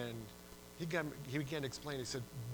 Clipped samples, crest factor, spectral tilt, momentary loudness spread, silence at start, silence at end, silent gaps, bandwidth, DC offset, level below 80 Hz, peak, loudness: under 0.1%; 22 dB; -5 dB/octave; 13 LU; 0 s; 0 s; none; over 20 kHz; under 0.1%; -64 dBFS; -22 dBFS; -42 LUFS